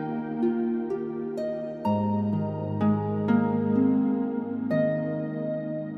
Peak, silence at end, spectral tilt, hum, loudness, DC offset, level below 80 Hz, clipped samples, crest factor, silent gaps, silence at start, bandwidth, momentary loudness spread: -12 dBFS; 0 s; -10.5 dB/octave; none; -27 LUFS; under 0.1%; -66 dBFS; under 0.1%; 14 dB; none; 0 s; 4.9 kHz; 8 LU